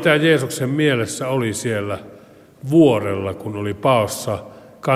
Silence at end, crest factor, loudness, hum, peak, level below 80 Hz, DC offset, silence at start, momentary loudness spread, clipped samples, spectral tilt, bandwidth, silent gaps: 0 s; 18 dB; -19 LUFS; none; -2 dBFS; -58 dBFS; under 0.1%; 0 s; 13 LU; under 0.1%; -5.5 dB/octave; 16 kHz; none